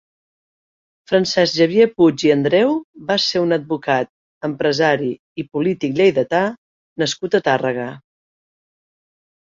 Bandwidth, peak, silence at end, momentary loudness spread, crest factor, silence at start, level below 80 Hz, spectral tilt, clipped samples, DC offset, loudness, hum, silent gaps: 7.6 kHz; -2 dBFS; 1.45 s; 12 LU; 18 dB; 1.1 s; -60 dBFS; -5 dB/octave; under 0.1%; under 0.1%; -18 LUFS; none; 2.84-2.93 s, 4.09-4.41 s, 5.19-5.35 s, 6.58-6.96 s